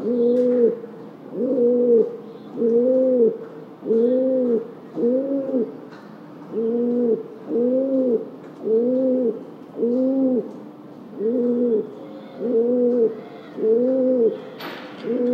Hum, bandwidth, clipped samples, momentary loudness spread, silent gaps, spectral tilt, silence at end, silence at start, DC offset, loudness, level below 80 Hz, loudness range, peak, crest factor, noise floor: none; 5.2 kHz; under 0.1%; 19 LU; none; -9 dB/octave; 0 s; 0 s; under 0.1%; -21 LUFS; -82 dBFS; 4 LU; -6 dBFS; 14 dB; -40 dBFS